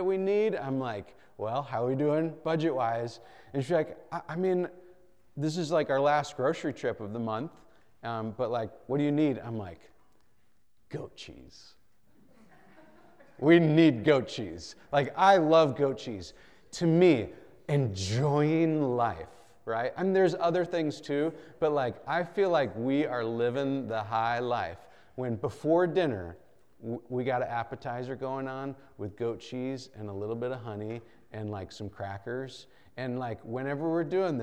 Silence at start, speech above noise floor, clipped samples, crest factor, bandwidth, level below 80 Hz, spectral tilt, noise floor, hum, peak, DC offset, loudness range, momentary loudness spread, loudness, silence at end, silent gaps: 0 s; 44 dB; under 0.1%; 20 dB; 10 kHz; -66 dBFS; -7 dB/octave; -73 dBFS; none; -8 dBFS; 0.1%; 11 LU; 18 LU; -29 LUFS; 0 s; none